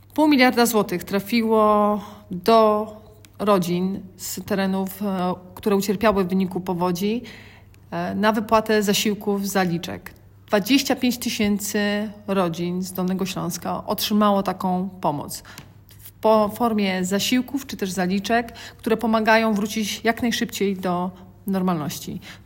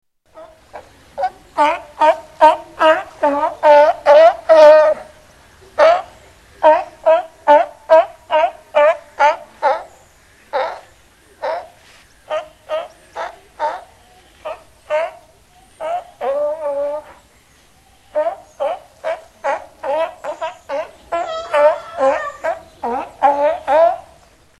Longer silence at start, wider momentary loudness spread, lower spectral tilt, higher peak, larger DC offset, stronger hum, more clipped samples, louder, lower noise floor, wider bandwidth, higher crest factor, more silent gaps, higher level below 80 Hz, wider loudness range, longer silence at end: second, 0.15 s vs 0.35 s; second, 12 LU vs 17 LU; first, -5 dB/octave vs -3.5 dB/octave; second, -4 dBFS vs 0 dBFS; neither; neither; neither; second, -22 LUFS vs -16 LUFS; second, -45 dBFS vs -50 dBFS; first, 16.5 kHz vs 11.5 kHz; about the same, 18 dB vs 16 dB; neither; about the same, -54 dBFS vs -56 dBFS; second, 3 LU vs 15 LU; second, 0.1 s vs 0.6 s